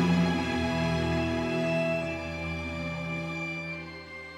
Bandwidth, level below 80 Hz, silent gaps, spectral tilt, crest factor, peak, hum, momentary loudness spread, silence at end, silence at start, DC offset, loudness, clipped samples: 11.5 kHz; -48 dBFS; none; -6.5 dB/octave; 16 dB; -14 dBFS; none; 8 LU; 0 s; 0 s; under 0.1%; -30 LUFS; under 0.1%